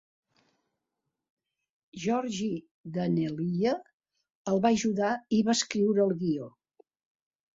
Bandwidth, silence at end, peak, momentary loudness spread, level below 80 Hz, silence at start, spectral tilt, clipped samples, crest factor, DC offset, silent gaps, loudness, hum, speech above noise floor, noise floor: 8 kHz; 1.05 s; -10 dBFS; 12 LU; -68 dBFS; 1.95 s; -5.5 dB/octave; under 0.1%; 20 dB; under 0.1%; 2.71-2.84 s, 3.93-4.00 s, 4.30-4.45 s; -29 LUFS; none; 58 dB; -85 dBFS